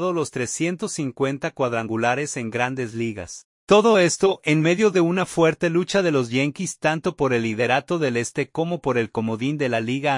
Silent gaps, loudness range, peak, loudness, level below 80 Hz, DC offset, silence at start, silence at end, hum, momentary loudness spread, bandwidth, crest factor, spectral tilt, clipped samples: 3.44-3.67 s; 5 LU; -2 dBFS; -22 LUFS; -58 dBFS; under 0.1%; 0 s; 0 s; none; 8 LU; 11.5 kHz; 18 dB; -5 dB/octave; under 0.1%